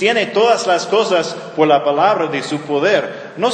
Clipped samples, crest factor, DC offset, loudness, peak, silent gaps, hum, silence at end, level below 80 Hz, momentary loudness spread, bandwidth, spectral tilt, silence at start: under 0.1%; 16 dB; under 0.1%; -15 LUFS; 0 dBFS; none; none; 0 s; -70 dBFS; 7 LU; 9.8 kHz; -4 dB/octave; 0 s